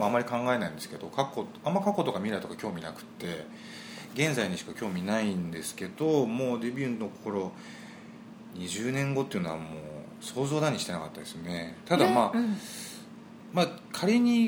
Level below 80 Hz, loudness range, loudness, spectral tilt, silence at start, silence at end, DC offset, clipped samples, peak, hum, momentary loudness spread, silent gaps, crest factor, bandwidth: -68 dBFS; 4 LU; -31 LUFS; -5.5 dB/octave; 0 s; 0 s; under 0.1%; under 0.1%; -8 dBFS; none; 16 LU; none; 22 dB; 19.5 kHz